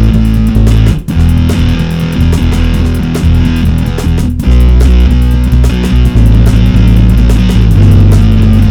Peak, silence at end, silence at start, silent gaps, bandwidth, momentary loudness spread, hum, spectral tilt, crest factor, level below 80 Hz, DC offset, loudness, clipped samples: 0 dBFS; 0 s; 0 s; none; 14.5 kHz; 5 LU; none; -7.5 dB/octave; 6 dB; -8 dBFS; 1%; -8 LUFS; 5%